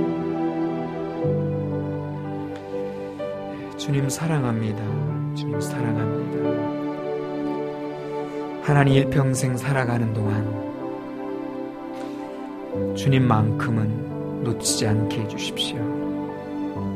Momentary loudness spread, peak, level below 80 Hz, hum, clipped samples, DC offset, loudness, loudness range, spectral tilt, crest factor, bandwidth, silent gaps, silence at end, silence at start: 11 LU; -2 dBFS; -52 dBFS; none; under 0.1%; under 0.1%; -25 LUFS; 5 LU; -6 dB/octave; 22 dB; 15 kHz; none; 0 s; 0 s